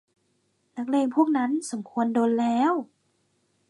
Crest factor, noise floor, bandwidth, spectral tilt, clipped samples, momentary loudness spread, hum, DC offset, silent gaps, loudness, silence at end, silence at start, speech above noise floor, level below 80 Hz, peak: 16 dB; -71 dBFS; 11.5 kHz; -5 dB/octave; under 0.1%; 11 LU; none; under 0.1%; none; -25 LUFS; 0.85 s; 0.75 s; 47 dB; -80 dBFS; -10 dBFS